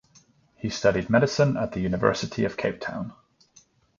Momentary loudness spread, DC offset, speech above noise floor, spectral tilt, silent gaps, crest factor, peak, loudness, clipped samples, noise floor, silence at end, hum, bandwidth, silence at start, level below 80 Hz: 12 LU; under 0.1%; 35 dB; -6 dB/octave; none; 22 dB; -4 dBFS; -25 LUFS; under 0.1%; -59 dBFS; 0.85 s; none; 7.6 kHz; 0.65 s; -52 dBFS